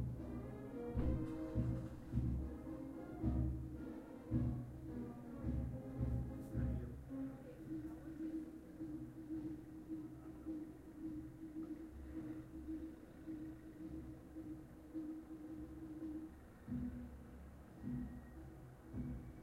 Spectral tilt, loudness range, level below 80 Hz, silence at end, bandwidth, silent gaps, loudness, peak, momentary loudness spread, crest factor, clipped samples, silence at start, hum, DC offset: -9.5 dB/octave; 7 LU; -52 dBFS; 0 s; 15.5 kHz; none; -47 LUFS; -26 dBFS; 12 LU; 20 dB; under 0.1%; 0 s; none; under 0.1%